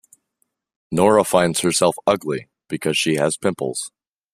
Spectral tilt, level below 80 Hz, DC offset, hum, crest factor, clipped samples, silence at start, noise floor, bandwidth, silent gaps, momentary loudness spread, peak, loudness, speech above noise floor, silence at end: -4 dB/octave; -58 dBFS; under 0.1%; none; 20 dB; under 0.1%; 0.9 s; -71 dBFS; 15.5 kHz; none; 13 LU; -2 dBFS; -19 LUFS; 53 dB; 0.45 s